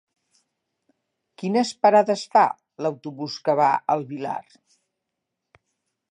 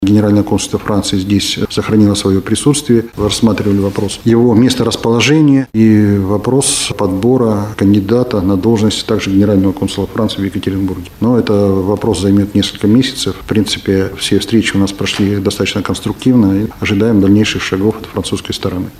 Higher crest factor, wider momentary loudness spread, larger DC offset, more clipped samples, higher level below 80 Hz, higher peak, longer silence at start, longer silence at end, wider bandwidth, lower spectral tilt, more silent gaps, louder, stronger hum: first, 20 dB vs 12 dB; first, 14 LU vs 7 LU; neither; neither; second, -80 dBFS vs -38 dBFS; second, -6 dBFS vs 0 dBFS; first, 1.4 s vs 0 s; first, 1.7 s vs 0 s; second, 10.5 kHz vs 15.5 kHz; about the same, -5 dB/octave vs -5.5 dB/octave; neither; second, -22 LUFS vs -12 LUFS; neither